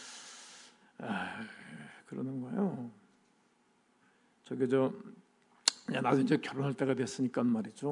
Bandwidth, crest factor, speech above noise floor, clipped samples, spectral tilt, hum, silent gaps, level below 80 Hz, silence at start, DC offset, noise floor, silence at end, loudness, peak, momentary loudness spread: 11 kHz; 28 dB; 38 dB; under 0.1%; -4.5 dB/octave; none; none; -86 dBFS; 0 s; under 0.1%; -71 dBFS; 0 s; -34 LUFS; -8 dBFS; 19 LU